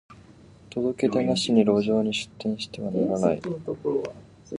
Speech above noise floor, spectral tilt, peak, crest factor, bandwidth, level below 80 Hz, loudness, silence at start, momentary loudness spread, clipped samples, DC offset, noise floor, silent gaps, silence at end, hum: 26 dB; -5.5 dB/octave; -6 dBFS; 18 dB; 11 kHz; -58 dBFS; -25 LUFS; 0.1 s; 10 LU; under 0.1%; under 0.1%; -50 dBFS; none; 0 s; none